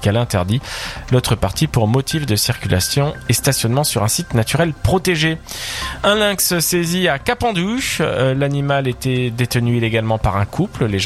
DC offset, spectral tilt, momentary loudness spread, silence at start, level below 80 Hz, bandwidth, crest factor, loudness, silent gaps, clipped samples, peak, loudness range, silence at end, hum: under 0.1%; -4.5 dB/octave; 4 LU; 0 s; -36 dBFS; 15.5 kHz; 16 dB; -17 LUFS; none; under 0.1%; 0 dBFS; 1 LU; 0 s; none